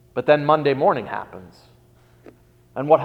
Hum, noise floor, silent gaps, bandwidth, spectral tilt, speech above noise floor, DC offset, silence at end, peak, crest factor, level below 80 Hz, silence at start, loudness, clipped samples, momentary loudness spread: none; -53 dBFS; none; 5.6 kHz; -8 dB/octave; 34 dB; under 0.1%; 0 s; -2 dBFS; 20 dB; -60 dBFS; 0.15 s; -20 LUFS; under 0.1%; 20 LU